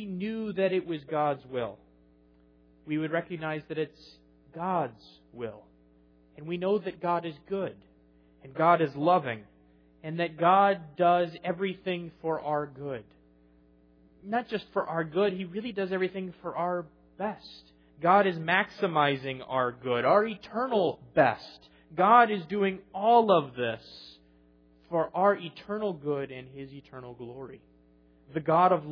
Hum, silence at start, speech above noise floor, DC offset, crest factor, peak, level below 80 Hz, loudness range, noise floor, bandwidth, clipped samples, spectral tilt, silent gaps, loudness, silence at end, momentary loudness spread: none; 0 s; 33 dB; under 0.1%; 22 dB; -8 dBFS; -68 dBFS; 9 LU; -61 dBFS; 5.4 kHz; under 0.1%; -8.5 dB/octave; none; -28 LUFS; 0 s; 18 LU